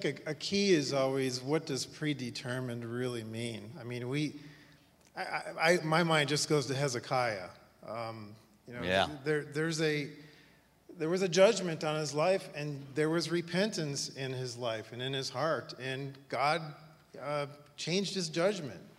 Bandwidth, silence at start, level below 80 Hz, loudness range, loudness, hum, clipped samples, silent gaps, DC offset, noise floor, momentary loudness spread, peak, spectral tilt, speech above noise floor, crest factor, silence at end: 15.5 kHz; 0 s; -72 dBFS; 5 LU; -33 LUFS; none; under 0.1%; none; under 0.1%; -63 dBFS; 14 LU; -12 dBFS; -4.5 dB/octave; 30 dB; 22 dB; 0.1 s